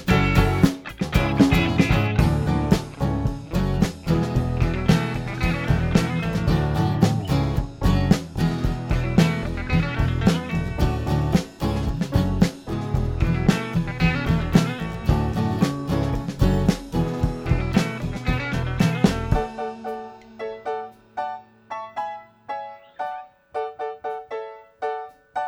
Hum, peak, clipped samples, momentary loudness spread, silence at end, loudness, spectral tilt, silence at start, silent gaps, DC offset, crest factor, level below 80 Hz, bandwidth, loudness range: none; -2 dBFS; under 0.1%; 13 LU; 0 s; -23 LUFS; -7 dB/octave; 0 s; none; under 0.1%; 20 dB; -30 dBFS; 16.5 kHz; 11 LU